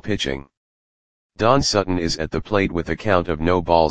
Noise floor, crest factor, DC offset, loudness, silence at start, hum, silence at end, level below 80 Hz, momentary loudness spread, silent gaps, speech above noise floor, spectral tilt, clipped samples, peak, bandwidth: under -90 dBFS; 20 dB; 1%; -20 LUFS; 0 s; none; 0 s; -38 dBFS; 7 LU; 0.57-1.30 s; over 71 dB; -5 dB/octave; under 0.1%; 0 dBFS; 9.8 kHz